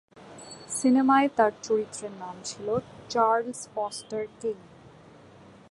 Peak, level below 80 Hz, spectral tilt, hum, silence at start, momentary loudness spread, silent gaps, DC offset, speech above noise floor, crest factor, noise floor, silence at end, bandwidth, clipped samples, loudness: -8 dBFS; -66 dBFS; -4 dB/octave; none; 0.15 s; 17 LU; none; under 0.1%; 25 dB; 20 dB; -51 dBFS; 1.15 s; 11.5 kHz; under 0.1%; -27 LUFS